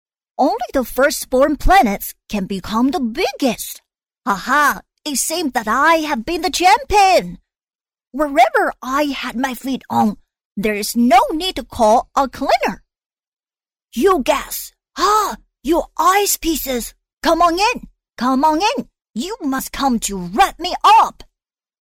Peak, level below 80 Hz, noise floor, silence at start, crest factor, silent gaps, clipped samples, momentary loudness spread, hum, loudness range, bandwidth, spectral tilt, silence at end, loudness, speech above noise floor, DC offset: -4 dBFS; -36 dBFS; under -90 dBFS; 0.4 s; 14 dB; 10.45-10.51 s, 13.28-13.37 s, 17.13-17.17 s; under 0.1%; 13 LU; none; 3 LU; 17 kHz; -3 dB/octave; 0.6 s; -17 LUFS; over 74 dB; under 0.1%